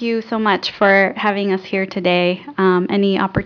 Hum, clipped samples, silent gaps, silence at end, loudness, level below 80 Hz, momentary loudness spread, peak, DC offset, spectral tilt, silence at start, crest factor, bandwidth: none; under 0.1%; none; 0 s; -17 LUFS; -46 dBFS; 7 LU; -2 dBFS; under 0.1%; -7 dB/octave; 0 s; 16 dB; 5.4 kHz